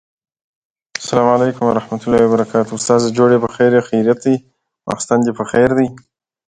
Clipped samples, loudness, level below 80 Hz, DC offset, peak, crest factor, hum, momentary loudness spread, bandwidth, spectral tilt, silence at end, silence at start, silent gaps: under 0.1%; -15 LUFS; -50 dBFS; under 0.1%; 0 dBFS; 16 dB; none; 8 LU; 9.6 kHz; -5.5 dB/octave; 0.5 s; 1 s; none